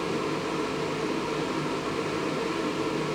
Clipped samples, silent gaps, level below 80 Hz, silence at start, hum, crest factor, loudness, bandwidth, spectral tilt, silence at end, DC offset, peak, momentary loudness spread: under 0.1%; none; -56 dBFS; 0 s; none; 12 dB; -29 LUFS; 18 kHz; -5 dB/octave; 0 s; under 0.1%; -16 dBFS; 1 LU